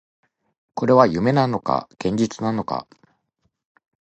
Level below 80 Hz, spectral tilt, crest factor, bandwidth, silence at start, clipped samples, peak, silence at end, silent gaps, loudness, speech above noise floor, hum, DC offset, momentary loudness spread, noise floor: -54 dBFS; -7 dB/octave; 22 dB; 8.6 kHz; 0.75 s; under 0.1%; 0 dBFS; 1.2 s; none; -20 LUFS; 52 dB; none; under 0.1%; 12 LU; -72 dBFS